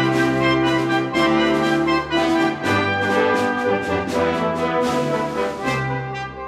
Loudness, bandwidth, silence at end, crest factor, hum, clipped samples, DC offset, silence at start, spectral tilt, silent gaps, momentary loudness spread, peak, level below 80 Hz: -19 LUFS; 14 kHz; 0 s; 14 dB; none; under 0.1%; under 0.1%; 0 s; -5.5 dB/octave; none; 5 LU; -6 dBFS; -48 dBFS